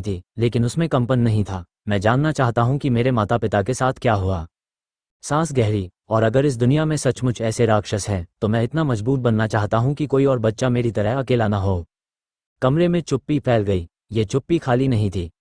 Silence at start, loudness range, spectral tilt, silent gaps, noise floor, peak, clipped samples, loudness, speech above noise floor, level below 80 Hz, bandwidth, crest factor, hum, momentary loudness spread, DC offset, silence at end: 0 s; 2 LU; -7 dB/octave; 5.11-5.20 s, 12.46-12.56 s; under -90 dBFS; -2 dBFS; under 0.1%; -20 LUFS; over 71 dB; -44 dBFS; 10.5 kHz; 18 dB; none; 7 LU; under 0.1%; 0.1 s